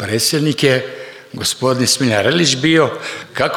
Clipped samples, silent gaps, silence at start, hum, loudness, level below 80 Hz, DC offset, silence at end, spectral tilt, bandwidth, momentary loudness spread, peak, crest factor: under 0.1%; none; 0 s; none; -15 LUFS; -58 dBFS; under 0.1%; 0 s; -3.5 dB/octave; 19 kHz; 13 LU; 0 dBFS; 16 dB